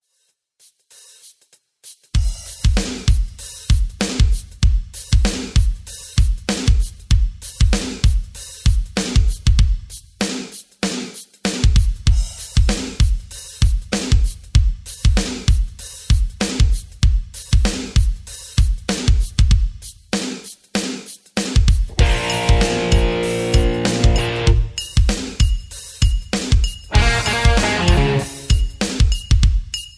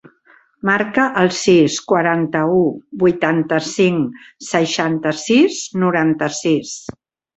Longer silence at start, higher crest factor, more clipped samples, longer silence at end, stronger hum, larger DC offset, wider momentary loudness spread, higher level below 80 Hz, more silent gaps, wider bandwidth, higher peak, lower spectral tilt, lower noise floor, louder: first, 1.85 s vs 0.65 s; about the same, 16 dB vs 16 dB; neither; second, 0.1 s vs 0.45 s; neither; neither; about the same, 9 LU vs 8 LU; first, -18 dBFS vs -56 dBFS; neither; first, 11 kHz vs 8.2 kHz; about the same, 0 dBFS vs -2 dBFS; about the same, -4.5 dB/octave vs -5 dB/octave; first, -67 dBFS vs -52 dBFS; second, -19 LUFS vs -16 LUFS